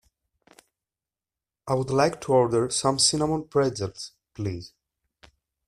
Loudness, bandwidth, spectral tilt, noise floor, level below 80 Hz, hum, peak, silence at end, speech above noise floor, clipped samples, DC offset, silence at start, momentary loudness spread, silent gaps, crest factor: -24 LUFS; 13.5 kHz; -4 dB/octave; under -90 dBFS; -58 dBFS; none; -6 dBFS; 1 s; over 66 dB; under 0.1%; under 0.1%; 1.65 s; 17 LU; none; 20 dB